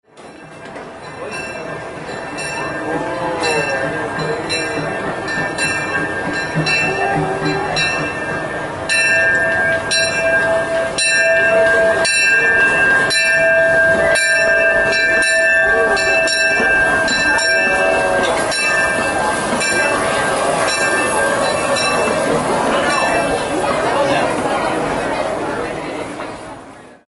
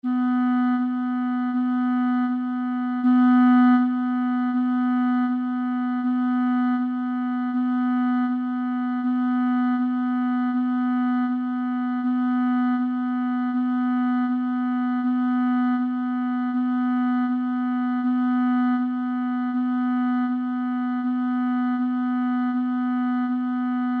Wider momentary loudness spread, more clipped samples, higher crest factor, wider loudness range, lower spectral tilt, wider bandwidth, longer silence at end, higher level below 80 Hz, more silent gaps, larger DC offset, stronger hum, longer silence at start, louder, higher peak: first, 12 LU vs 4 LU; neither; about the same, 14 dB vs 14 dB; first, 8 LU vs 4 LU; second, -3 dB/octave vs -7.5 dB/octave; first, 11.5 kHz vs 4.2 kHz; first, 0.15 s vs 0 s; first, -44 dBFS vs -80 dBFS; neither; neither; neither; about the same, 0.15 s vs 0.05 s; first, -15 LUFS vs -23 LUFS; first, -2 dBFS vs -10 dBFS